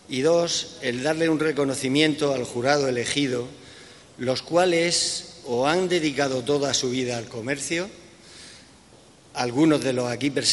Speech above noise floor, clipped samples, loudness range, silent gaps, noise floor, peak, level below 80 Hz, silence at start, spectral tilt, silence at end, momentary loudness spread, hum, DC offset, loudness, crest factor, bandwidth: 28 dB; under 0.1%; 4 LU; none; -52 dBFS; -4 dBFS; -60 dBFS; 0.1 s; -3.5 dB/octave; 0 s; 11 LU; none; under 0.1%; -23 LUFS; 20 dB; 11.5 kHz